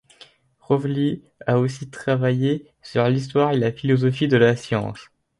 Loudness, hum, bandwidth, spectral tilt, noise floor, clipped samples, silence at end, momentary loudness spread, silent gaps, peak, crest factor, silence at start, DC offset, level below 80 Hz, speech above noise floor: -21 LUFS; none; 11 kHz; -7.5 dB/octave; -51 dBFS; under 0.1%; 0.35 s; 10 LU; none; -2 dBFS; 18 dB; 0.7 s; under 0.1%; -56 dBFS; 31 dB